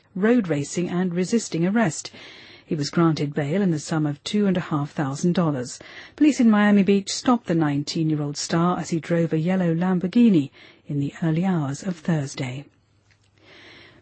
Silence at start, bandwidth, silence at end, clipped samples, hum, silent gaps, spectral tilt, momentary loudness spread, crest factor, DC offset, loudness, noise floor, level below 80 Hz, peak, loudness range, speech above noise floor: 0.15 s; 8.8 kHz; 0.35 s; under 0.1%; none; none; -6 dB/octave; 13 LU; 14 dB; under 0.1%; -22 LUFS; -60 dBFS; -62 dBFS; -8 dBFS; 3 LU; 39 dB